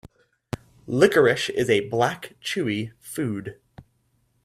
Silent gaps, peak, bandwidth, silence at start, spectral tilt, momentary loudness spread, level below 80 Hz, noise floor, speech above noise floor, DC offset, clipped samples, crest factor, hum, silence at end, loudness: none; 0 dBFS; 15.5 kHz; 0.05 s; -5 dB/octave; 18 LU; -58 dBFS; -67 dBFS; 45 dB; under 0.1%; under 0.1%; 24 dB; none; 0.65 s; -23 LUFS